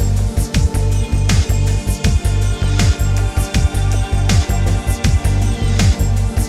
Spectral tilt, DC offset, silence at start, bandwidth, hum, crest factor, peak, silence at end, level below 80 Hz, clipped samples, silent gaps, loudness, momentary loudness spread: -5.5 dB/octave; under 0.1%; 0 s; 14.5 kHz; none; 12 dB; -4 dBFS; 0 s; -18 dBFS; under 0.1%; none; -16 LUFS; 3 LU